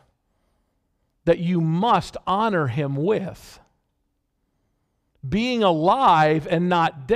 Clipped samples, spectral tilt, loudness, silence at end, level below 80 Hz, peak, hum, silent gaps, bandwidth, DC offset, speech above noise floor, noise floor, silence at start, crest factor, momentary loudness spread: under 0.1%; -7 dB/octave; -21 LUFS; 0 s; -52 dBFS; -4 dBFS; none; none; 12.5 kHz; under 0.1%; 52 dB; -73 dBFS; 1.25 s; 18 dB; 9 LU